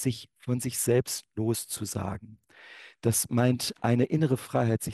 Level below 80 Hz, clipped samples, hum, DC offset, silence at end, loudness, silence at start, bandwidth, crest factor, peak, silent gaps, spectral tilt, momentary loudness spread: -60 dBFS; under 0.1%; none; under 0.1%; 0 s; -28 LUFS; 0 s; 13 kHz; 18 dB; -10 dBFS; none; -5 dB/octave; 11 LU